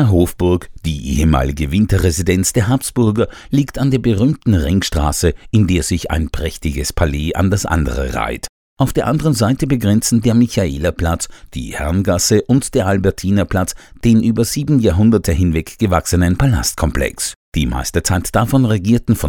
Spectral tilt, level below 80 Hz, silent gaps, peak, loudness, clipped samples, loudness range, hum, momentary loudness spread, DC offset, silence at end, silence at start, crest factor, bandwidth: -5.5 dB/octave; -26 dBFS; 8.49-8.77 s, 17.36-17.52 s; 0 dBFS; -16 LUFS; under 0.1%; 3 LU; none; 7 LU; under 0.1%; 0 s; 0 s; 14 dB; 18.5 kHz